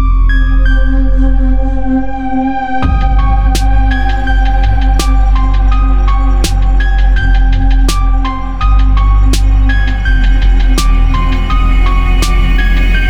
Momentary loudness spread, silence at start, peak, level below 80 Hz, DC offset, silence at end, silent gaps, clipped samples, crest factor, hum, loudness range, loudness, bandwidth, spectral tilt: 3 LU; 0 s; 0 dBFS; -8 dBFS; under 0.1%; 0 s; none; under 0.1%; 8 dB; none; 1 LU; -12 LUFS; 11.5 kHz; -5.5 dB/octave